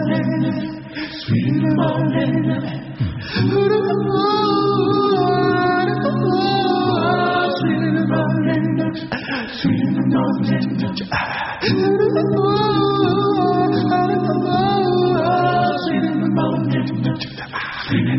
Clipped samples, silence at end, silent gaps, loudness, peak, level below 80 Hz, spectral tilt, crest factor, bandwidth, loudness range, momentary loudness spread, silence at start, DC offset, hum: under 0.1%; 0 s; none; -18 LUFS; -6 dBFS; -48 dBFS; -5.5 dB/octave; 12 dB; 6 kHz; 3 LU; 7 LU; 0 s; under 0.1%; none